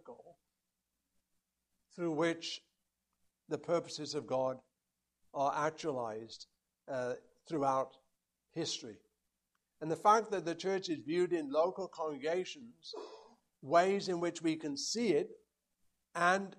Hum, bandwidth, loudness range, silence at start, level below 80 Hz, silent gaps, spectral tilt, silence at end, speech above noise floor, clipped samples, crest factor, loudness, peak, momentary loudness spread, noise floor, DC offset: none; 12 kHz; 6 LU; 0.05 s; -82 dBFS; none; -4.5 dB/octave; 0.05 s; 52 dB; under 0.1%; 22 dB; -36 LUFS; -14 dBFS; 17 LU; -88 dBFS; under 0.1%